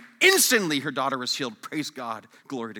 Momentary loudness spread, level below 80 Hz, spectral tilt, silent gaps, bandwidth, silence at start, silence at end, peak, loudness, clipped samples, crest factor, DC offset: 18 LU; -84 dBFS; -1.5 dB/octave; none; 19 kHz; 0 s; 0 s; -4 dBFS; -23 LUFS; under 0.1%; 22 dB; under 0.1%